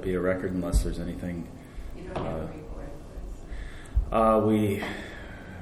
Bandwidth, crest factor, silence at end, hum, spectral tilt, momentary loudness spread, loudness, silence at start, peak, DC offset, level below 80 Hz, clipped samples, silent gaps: 14.5 kHz; 18 dB; 0 s; none; -7 dB/octave; 20 LU; -28 LUFS; 0 s; -10 dBFS; under 0.1%; -36 dBFS; under 0.1%; none